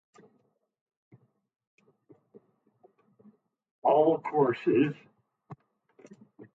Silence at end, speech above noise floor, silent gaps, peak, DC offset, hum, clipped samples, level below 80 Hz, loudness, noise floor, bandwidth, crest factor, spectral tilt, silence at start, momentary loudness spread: 0.1 s; 46 dB; none; -12 dBFS; under 0.1%; none; under 0.1%; -80 dBFS; -26 LUFS; -72 dBFS; 7.4 kHz; 20 dB; -9 dB/octave; 3.85 s; 7 LU